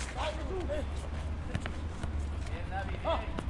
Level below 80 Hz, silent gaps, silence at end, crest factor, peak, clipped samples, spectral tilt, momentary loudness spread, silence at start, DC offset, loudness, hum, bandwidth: -40 dBFS; none; 0 s; 18 dB; -18 dBFS; under 0.1%; -6 dB/octave; 5 LU; 0 s; under 0.1%; -37 LUFS; none; 11.5 kHz